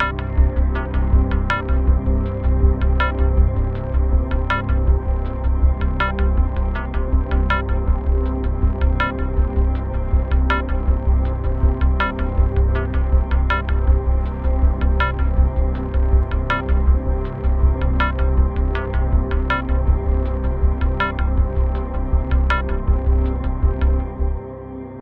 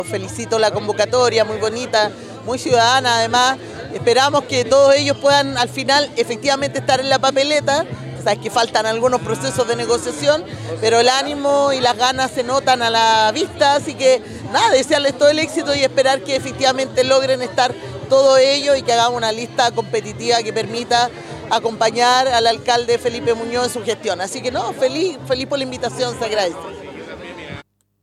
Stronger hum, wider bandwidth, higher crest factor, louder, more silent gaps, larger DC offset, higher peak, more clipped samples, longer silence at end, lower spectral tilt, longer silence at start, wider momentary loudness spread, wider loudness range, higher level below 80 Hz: neither; second, 4.3 kHz vs 13.5 kHz; about the same, 14 dB vs 14 dB; second, -20 LUFS vs -16 LUFS; neither; first, 0.3% vs under 0.1%; about the same, -2 dBFS vs -2 dBFS; neither; second, 0 s vs 0.4 s; first, -9 dB/octave vs -3 dB/octave; about the same, 0 s vs 0 s; second, 4 LU vs 9 LU; second, 1 LU vs 4 LU; first, -18 dBFS vs -52 dBFS